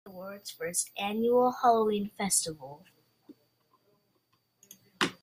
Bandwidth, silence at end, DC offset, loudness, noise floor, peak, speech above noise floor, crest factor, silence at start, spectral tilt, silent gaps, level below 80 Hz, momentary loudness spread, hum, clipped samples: 15.5 kHz; 0.1 s; under 0.1%; -28 LUFS; -74 dBFS; -10 dBFS; 45 dB; 22 dB; 0.05 s; -3 dB/octave; none; -72 dBFS; 17 LU; none; under 0.1%